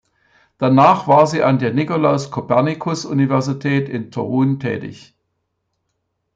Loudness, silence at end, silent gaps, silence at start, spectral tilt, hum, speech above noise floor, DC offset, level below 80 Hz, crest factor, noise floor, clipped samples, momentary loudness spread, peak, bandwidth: -17 LUFS; 1.4 s; none; 0.6 s; -7 dB/octave; none; 56 dB; under 0.1%; -60 dBFS; 16 dB; -72 dBFS; under 0.1%; 11 LU; -2 dBFS; 7.8 kHz